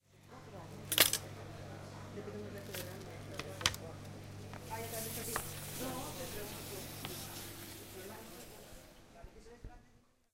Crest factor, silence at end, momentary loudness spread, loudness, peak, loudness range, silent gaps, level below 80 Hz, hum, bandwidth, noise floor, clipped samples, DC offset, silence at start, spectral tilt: 34 dB; 0.35 s; 20 LU; -39 LUFS; -8 dBFS; 11 LU; none; -60 dBFS; none; 16.5 kHz; -67 dBFS; under 0.1%; under 0.1%; 0.1 s; -2 dB/octave